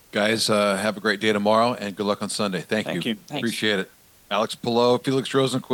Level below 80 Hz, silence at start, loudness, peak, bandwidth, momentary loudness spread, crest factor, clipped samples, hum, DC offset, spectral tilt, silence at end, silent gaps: -66 dBFS; 0.15 s; -23 LUFS; -6 dBFS; 19 kHz; 7 LU; 16 dB; under 0.1%; none; under 0.1%; -4 dB/octave; 0 s; none